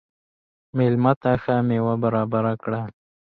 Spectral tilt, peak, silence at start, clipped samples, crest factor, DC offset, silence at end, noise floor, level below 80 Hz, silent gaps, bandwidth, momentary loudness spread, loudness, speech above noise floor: -11 dB/octave; -4 dBFS; 0.75 s; under 0.1%; 18 dB; under 0.1%; 0.35 s; under -90 dBFS; -54 dBFS; 1.16-1.21 s; 4.6 kHz; 10 LU; -22 LUFS; over 69 dB